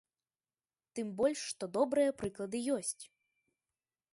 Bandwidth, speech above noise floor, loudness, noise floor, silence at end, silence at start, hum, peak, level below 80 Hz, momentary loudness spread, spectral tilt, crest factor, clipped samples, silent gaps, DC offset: 11.5 kHz; over 55 dB; -35 LUFS; under -90 dBFS; 1.05 s; 0.95 s; none; -18 dBFS; -72 dBFS; 14 LU; -4 dB/octave; 18 dB; under 0.1%; none; under 0.1%